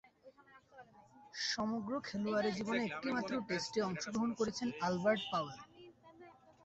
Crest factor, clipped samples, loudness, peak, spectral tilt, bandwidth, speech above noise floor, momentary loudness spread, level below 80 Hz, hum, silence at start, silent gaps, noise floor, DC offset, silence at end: 20 dB; under 0.1%; -38 LUFS; -20 dBFS; -3.5 dB/octave; 8 kHz; 25 dB; 6 LU; -72 dBFS; none; 0.25 s; none; -63 dBFS; under 0.1%; 0.15 s